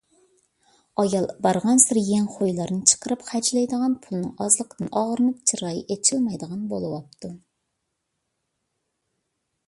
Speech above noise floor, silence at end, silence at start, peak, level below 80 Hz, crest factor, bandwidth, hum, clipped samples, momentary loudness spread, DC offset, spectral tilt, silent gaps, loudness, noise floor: 55 dB; 2.3 s; 1 s; 0 dBFS; -64 dBFS; 24 dB; 11.5 kHz; none; under 0.1%; 13 LU; under 0.1%; -4 dB/octave; none; -22 LUFS; -78 dBFS